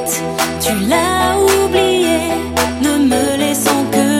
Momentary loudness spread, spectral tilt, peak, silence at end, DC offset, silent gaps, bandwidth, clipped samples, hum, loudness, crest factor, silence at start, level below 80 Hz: 4 LU; -3.5 dB/octave; 0 dBFS; 0 s; under 0.1%; none; 16.5 kHz; under 0.1%; none; -14 LUFS; 14 dB; 0 s; -40 dBFS